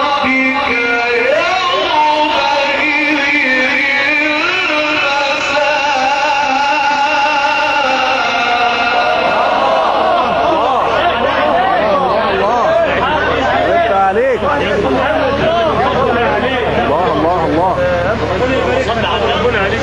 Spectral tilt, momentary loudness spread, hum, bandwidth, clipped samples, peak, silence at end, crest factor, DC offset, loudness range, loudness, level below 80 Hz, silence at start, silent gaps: -4.5 dB/octave; 3 LU; none; 11.5 kHz; under 0.1%; 0 dBFS; 0 s; 12 dB; under 0.1%; 2 LU; -12 LUFS; -34 dBFS; 0 s; none